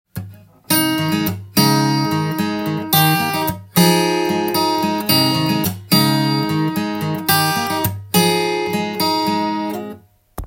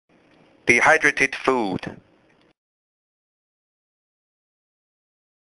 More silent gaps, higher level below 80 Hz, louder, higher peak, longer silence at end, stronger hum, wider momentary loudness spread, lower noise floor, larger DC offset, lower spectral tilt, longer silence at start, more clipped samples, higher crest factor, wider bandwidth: neither; first, -48 dBFS vs -58 dBFS; about the same, -17 LUFS vs -18 LUFS; about the same, 0 dBFS vs 0 dBFS; second, 0 s vs 3.5 s; neither; second, 7 LU vs 15 LU; second, -38 dBFS vs -59 dBFS; neither; about the same, -4.5 dB/octave vs -3.5 dB/octave; second, 0.15 s vs 0.65 s; neither; second, 18 dB vs 24 dB; first, 17 kHz vs 11.5 kHz